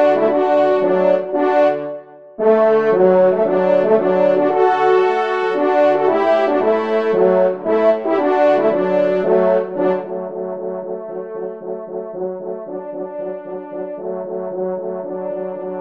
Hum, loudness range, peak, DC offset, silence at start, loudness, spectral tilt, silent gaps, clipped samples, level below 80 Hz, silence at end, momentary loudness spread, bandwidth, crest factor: none; 12 LU; -2 dBFS; 0.3%; 0 s; -16 LUFS; -8 dB/octave; none; under 0.1%; -68 dBFS; 0 s; 13 LU; 6.2 kHz; 14 dB